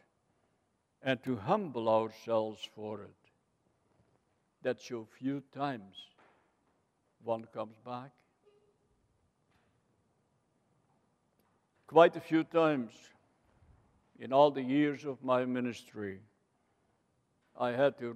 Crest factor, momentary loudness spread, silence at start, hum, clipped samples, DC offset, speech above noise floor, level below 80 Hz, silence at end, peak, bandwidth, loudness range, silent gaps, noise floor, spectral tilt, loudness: 26 dB; 18 LU; 1.05 s; none; under 0.1%; under 0.1%; 45 dB; -82 dBFS; 0 s; -10 dBFS; 12.5 kHz; 14 LU; none; -78 dBFS; -6.5 dB/octave; -32 LUFS